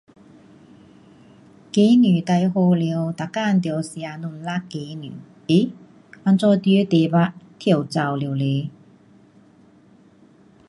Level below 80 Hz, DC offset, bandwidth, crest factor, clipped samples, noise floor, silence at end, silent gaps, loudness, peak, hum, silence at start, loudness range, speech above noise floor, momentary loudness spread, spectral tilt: -66 dBFS; under 0.1%; 11.5 kHz; 16 dB; under 0.1%; -52 dBFS; 2 s; none; -20 LUFS; -4 dBFS; none; 1.75 s; 5 LU; 33 dB; 15 LU; -7.5 dB/octave